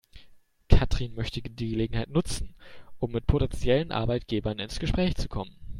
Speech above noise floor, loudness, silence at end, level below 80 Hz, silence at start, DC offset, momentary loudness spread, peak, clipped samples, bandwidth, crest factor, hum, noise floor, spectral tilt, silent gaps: 26 dB; -29 LUFS; 0 s; -32 dBFS; 0.15 s; under 0.1%; 10 LU; -2 dBFS; under 0.1%; 12 kHz; 24 dB; none; -54 dBFS; -6.5 dB/octave; none